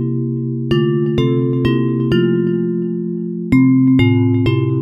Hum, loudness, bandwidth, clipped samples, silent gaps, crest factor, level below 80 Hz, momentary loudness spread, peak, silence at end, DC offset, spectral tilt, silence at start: none; -15 LUFS; 5.6 kHz; under 0.1%; none; 14 dB; -40 dBFS; 9 LU; -2 dBFS; 0 s; under 0.1%; -9.5 dB/octave; 0 s